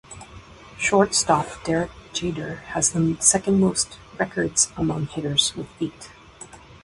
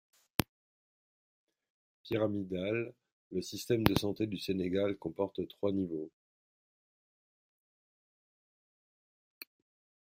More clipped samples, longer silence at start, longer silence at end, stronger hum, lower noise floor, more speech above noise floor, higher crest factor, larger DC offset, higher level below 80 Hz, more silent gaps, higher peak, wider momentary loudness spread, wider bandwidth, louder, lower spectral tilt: neither; second, 0.1 s vs 2.05 s; second, 0.1 s vs 4 s; neither; second, -44 dBFS vs under -90 dBFS; second, 22 dB vs over 56 dB; second, 22 dB vs 34 dB; neither; first, -50 dBFS vs -62 dBFS; second, none vs 3.12-3.31 s; about the same, -2 dBFS vs -4 dBFS; first, 23 LU vs 16 LU; second, 11.5 kHz vs 16 kHz; first, -22 LUFS vs -35 LUFS; second, -3 dB/octave vs -6 dB/octave